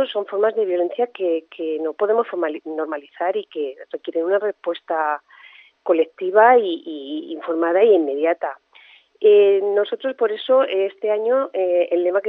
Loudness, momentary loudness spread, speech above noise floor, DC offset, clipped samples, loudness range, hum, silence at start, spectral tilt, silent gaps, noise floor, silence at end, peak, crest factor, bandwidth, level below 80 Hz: -20 LUFS; 14 LU; 31 dB; under 0.1%; under 0.1%; 6 LU; none; 0 s; -7 dB/octave; none; -50 dBFS; 0 s; -2 dBFS; 18 dB; 4.1 kHz; -86 dBFS